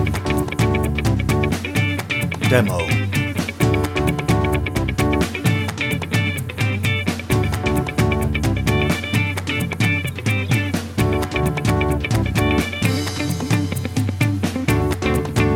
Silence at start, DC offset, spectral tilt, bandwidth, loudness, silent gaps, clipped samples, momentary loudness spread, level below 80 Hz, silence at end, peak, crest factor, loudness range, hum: 0 s; under 0.1%; -5.5 dB/octave; 17 kHz; -20 LUFS; none; under 0.1%; 3 LU; -32 dBFS; 0 s; -2 dBFS; 18 dB; 1 LU; none